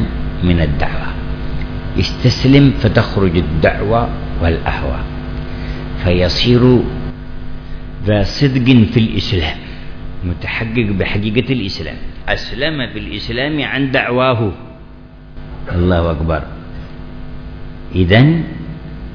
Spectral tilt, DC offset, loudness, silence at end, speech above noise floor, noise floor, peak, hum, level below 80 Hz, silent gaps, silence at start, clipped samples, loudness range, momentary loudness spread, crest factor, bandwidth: -7.5 dB/octave; under 0.1%; -15 LUFS; 0 s; 22 dB; -35 dBFS; 0 dBFS; none; -26 dBFS; none; 0 s; 0.2%; 5 LU; 21 LU; 16 dB; 5.4 kHz